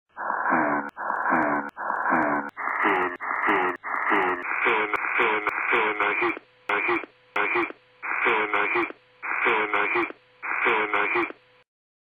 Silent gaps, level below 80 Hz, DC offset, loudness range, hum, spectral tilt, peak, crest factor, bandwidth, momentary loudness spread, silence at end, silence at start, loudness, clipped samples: none; -66 dBFS; under 0.1%; 2 LU; none; -5.5 dB/octave; -8 dBFS; 18 dB; 10.5 kHz; 8 LU; 0.75 s; 0.15 s; -24 LUFS; under 0.1%